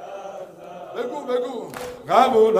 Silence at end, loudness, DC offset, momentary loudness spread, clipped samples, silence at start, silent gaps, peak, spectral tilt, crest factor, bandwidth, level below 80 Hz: 0 s; -22 LUFS; under 0.1%; 21 LU; under 0.1%; 0 s; none; -2 dBFS; -4.5 dB/octave; 20 dB; 15.5 kHz; -62 dBFS